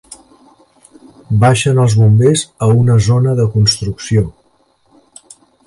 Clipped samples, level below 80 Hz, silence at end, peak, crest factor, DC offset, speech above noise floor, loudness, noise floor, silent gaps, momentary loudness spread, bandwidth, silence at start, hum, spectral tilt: under 0.1%; -38 dBFS; 1.35 s; 0 dBFS; 12 dB; under 0.1%; 45 dB; -12 LUFS; -56 dBFS; none; 7 LU; 11.5 kHz; 1.3 s; none; -6 dB/octave